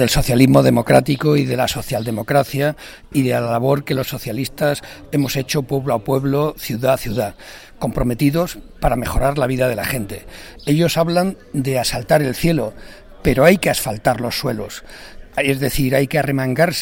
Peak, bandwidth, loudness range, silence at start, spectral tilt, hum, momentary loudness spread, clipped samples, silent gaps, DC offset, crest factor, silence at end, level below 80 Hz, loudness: 0 dBFS; 17 kHz; 3 LU; 0 s; -5.5 dB/octave; none; 12 LU; under 0.1%; none; under 0.1%; 18 dB; 0 s; -34 dBFS; -18 LUFS